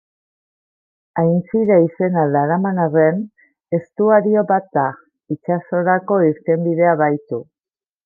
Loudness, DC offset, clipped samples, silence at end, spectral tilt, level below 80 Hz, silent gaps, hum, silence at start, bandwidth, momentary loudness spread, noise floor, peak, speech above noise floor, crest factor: -17 LUFS; under 0.1%; under 0.1%; 0.65 s; -13 dB/octave; -66 dBFS; none; none; 1.15 s; 2.4 kHz; 11 LU; under -90 dBFS; -2 dBFS; over 74 dB; 16 dB